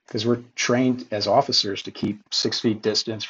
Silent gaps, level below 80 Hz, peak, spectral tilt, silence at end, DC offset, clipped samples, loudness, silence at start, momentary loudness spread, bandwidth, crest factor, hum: none; -66 dBFS; -6 dBFS; -4 dB/octave; 0 s; under 0.1%; under 0.1%; -22 LUFS; 0.15 s; 8 LU; 8 kHz; 18 dB; none